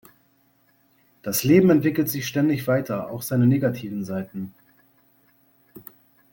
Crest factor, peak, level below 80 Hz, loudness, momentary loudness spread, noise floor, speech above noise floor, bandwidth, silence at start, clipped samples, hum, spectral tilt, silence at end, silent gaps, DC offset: 20 dB; -4 dBFS; -60 dBFS; -22 LUFS; 20 LU; -63 dBFS; 41 dB; 17 kHz; 1.25 s; under 0.1%; none; -6.5 dB/octave; 0.5 s; none; under 0.1%